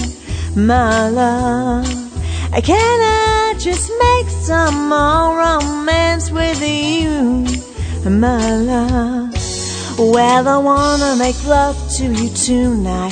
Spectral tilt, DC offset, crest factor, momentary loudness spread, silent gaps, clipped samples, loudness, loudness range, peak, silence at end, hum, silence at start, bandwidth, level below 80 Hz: -4.5 dB/octave; under 0.1%; 14 dB; 8 LU; none; under 0.1%; -15 LUFS; 2 LU; 0 dBFS; 0 s; none; 0 s; 9.4 kHz; -26 dBFS